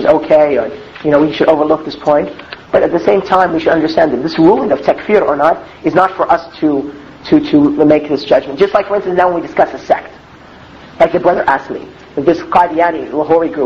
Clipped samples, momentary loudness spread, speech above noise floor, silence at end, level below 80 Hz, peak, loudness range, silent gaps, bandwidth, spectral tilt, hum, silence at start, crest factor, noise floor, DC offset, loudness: 0.4%; 7 LU; 25 dB; 0 s; -44 dBFS; 0 dBFS; 3 LU; none; 7.2 kHz; -7 dB/octave; none; 0 s; 12 dB; -37 dBFS; 0.1%; -12 LUFS